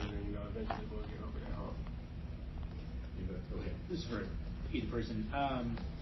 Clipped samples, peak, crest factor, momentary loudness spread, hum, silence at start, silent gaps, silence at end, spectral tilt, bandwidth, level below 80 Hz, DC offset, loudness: under 0.1%; -22 dBFS; 20 dB; 9 LU; none; 0 s; none; 0 s; -6 dB/octave; 6 kHz; -44 dBFS; under 0.1%; -42 LUFS